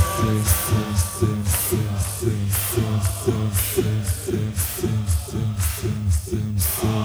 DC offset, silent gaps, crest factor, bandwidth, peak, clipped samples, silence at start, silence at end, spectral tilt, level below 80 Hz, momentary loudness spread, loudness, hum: under 0.1%; none; 16 dB; over 20 kHz; -4 dBFS; under 0.1%; 0 s; 0 s; -5 dB/octave; -34 dBFS; 4 LU; -22 LUFS; none